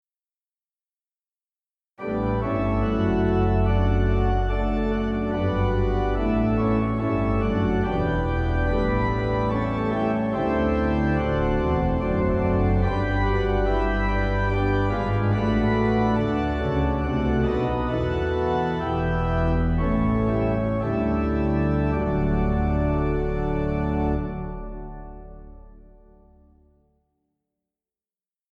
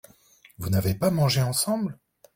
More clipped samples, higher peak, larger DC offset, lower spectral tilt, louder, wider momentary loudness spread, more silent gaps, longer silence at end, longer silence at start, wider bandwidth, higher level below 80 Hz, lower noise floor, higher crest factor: neither; about the same, -8 dBFS vs -10 dBFS; neither; first, -9 dB/octave vs -5 dB/octave; about the same, -23 LUFS vs -25 LUFS; second, 3 LU vs 9 LU; neither; first, 2.75 s vs 0.45 s; first, 2 s vs 0.6 s; second, 6.2 kHz vs 16.5 kHz; first, -30 dBFS vs -52 dBFS; first, under -90 dBFS vs -56 dBFS; about the same, 14 dB vs 16 dB